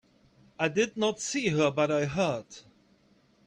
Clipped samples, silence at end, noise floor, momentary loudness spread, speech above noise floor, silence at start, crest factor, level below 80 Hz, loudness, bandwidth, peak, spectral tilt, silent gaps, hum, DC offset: under 0.1%; 0.85 s; -64 dBFS; 11 LU; 36 dB; 0.6 s; 20 dB; -64 dBFS; -28 LUFS; 10.5 kHz; -12 dBFS; -4.5 dB/octave; none; none; under 0.1%